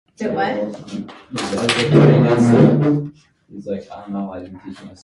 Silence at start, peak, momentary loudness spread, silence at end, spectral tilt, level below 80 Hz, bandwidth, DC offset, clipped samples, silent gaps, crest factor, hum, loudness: 0.2 s; 0 dBFS; 21 LU; 0.1 s; -7 dB/octave; -52 dBFS; 11.5 kHz; under 0.1%; under 0.1%; none; 18 dB; none; -16 LUFS